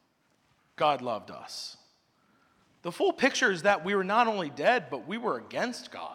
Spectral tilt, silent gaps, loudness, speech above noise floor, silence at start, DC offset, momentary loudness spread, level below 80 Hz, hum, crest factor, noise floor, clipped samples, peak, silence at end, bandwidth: -3.5 dB/octave; none; -28 LUFS; 42 dB; 0.8 s; under 0.1%; 14 LU; -76 dBFS; none; 20 dB; -70 dBFS; under 0.1%; -10 dBFS; 0 s; 15 kHz